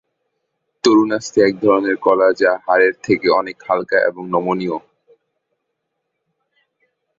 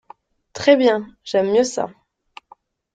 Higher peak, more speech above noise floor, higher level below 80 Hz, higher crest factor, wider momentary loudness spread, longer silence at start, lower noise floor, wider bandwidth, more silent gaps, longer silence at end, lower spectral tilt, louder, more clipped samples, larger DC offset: about the same, 0 dBFS vs -2 dBFS; first, 59 dB vs 35 dB; about the same, -60 dBFS vs -62 dBFS; about the same, 18 dB vs 18 dB; second, 7 LU vs 14 LU; first, 0.85 s vs 0.55 s; first, -75 dBFS vs -52 dBFS; second, 7.8 kHz vs 9.2 kHz; neither; first, 2.4 s vs 1.05 s; about the same, -5 dB/octave vs -4 dB/octave; about the same, -16 LUFS vs -18 LUFS; neither; neither